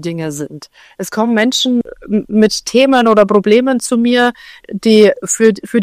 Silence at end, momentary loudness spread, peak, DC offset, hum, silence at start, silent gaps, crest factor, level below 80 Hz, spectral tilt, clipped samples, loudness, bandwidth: 0 s; 13 LU; 0 dBFS; under 0.1%; none; 0 s; none; 12 dB; -52 dBFS; -4 dB/octave; 0.6%; -12 LUFS; 15.5 kHz